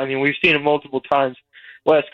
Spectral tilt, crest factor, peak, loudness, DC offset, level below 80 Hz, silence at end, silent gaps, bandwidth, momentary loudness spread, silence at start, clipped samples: -6.5 dB/octave; 16 dB; -4 dBFS; -18 LUFS; under 0.1%; -56 dBFS; 0.05 s; none; 7.4 kHz; 8 LU; 0 s; under 0.1%